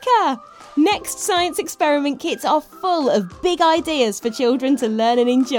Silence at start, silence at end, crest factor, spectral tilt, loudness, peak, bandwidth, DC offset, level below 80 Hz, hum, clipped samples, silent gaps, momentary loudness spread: 0 s; 0 s; 14 dB; -3.5 dB/octave; -19 LUFS; -4 dBFS; 19 kHz; under 0.1%; -54 dBFS; none; under 0.1%; none; 6 LU